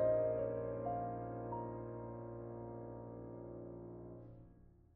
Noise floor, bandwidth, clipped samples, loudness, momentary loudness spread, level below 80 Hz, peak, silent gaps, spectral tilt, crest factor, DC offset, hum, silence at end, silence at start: -63 dBFS; 3 kHz; under 0.1%; -44 LUFS; 15 LU; -64 dBFS; -26 dBFS; none; -6.5 dB/octave; 18 dB; under 0.1%; none; 0.25 s; 0 s